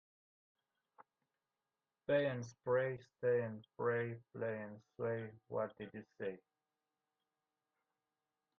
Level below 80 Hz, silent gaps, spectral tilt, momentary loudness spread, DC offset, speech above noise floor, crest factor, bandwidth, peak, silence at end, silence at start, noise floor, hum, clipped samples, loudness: -84 dBFS; none; -7 dB/octave; 12 LU; under 0.1%; over 50 dB; 20 dB; 6.8 kHz; -24 dBFS; 2.2 s; 1 s; under -90 dBFS; none; under 0.1%; -41 LUFS